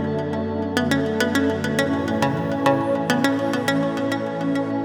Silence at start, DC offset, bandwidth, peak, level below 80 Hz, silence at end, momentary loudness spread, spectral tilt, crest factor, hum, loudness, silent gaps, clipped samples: 0 s; under 0.1%; 20 kHz; -2 dBFS; -60 dBFS; 0 s; 4 LU; -5.5 dB/octave; 18 dB; none; -22 LUFS; none; under 0.1%